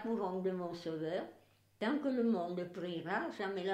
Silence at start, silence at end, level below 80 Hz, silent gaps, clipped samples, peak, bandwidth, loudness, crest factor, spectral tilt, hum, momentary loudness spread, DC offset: 0 s; 0 s; -82 dBFS; none; under 0.1%; -24 dBFS; 10 kHz; -38 LUFS; 14 dB; -7 dB/octave; none; 8 LU; under 0.1%